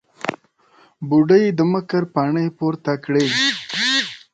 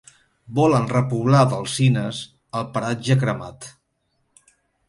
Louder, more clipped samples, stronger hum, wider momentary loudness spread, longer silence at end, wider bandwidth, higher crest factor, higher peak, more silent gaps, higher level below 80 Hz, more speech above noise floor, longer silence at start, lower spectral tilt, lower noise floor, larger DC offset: first, -18 LUFS vs -21 LUFS; neither; neither; second, 12 LU vs 15 LU; second, 0.15 s vs 1.2 s; second, 9.2 kHz vs 11.5 kHz; about the same, 16 dB vs 18 dB; about the same, -2 dBFS vs -4 dBFS; neither; second, -64 dBFS vs -56 dBFS; second, 37 dB vs 51 dB; second, 0.25 s vs 0.5 s; second, -5 dB/octave vs -6.5 dB/octave; second, -55 dBFS vs -70 dBFS; neither